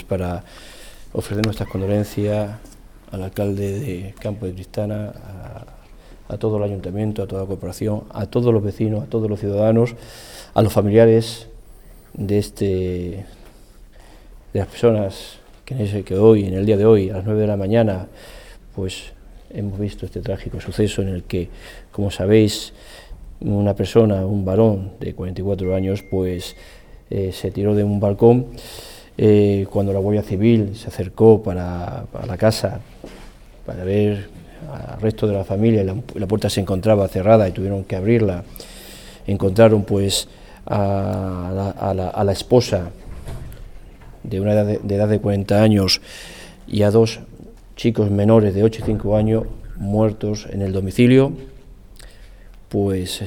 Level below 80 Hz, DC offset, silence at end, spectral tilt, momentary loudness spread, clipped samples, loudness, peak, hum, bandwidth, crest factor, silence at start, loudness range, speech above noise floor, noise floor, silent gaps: -40 dBFS; under 0.1%; 0 s; -7 dB/octave; 20 LU; under 0.1%; -19 LUFS; 0 dBFS; none; 17 kHz; 18 dB; 0 s; 8 LU; 25 dB; -44 dBFS; none